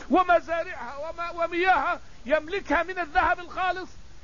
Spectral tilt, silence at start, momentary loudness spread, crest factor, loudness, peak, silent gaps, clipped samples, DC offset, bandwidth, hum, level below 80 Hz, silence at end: -5 dB/octave; 0 s; 12 LU; 18 dB; -26 LUFS; -8 dBFS; none; under 0.1%; 0.8%; 7.4 kHz; none; -48 dBFS; 0 s